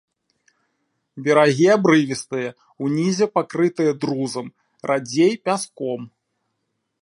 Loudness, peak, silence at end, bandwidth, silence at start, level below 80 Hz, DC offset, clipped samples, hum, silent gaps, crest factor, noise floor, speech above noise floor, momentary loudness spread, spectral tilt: -20 LUFS; -2 dBFS; 0.95 s; 11.5 kHz; 1.15 s; -70 dBFS; under 0.1%; under 0.1%; none; none; 20 dB; -75 dBFS; 56 dB; 13 LU; -5.5 dB/octave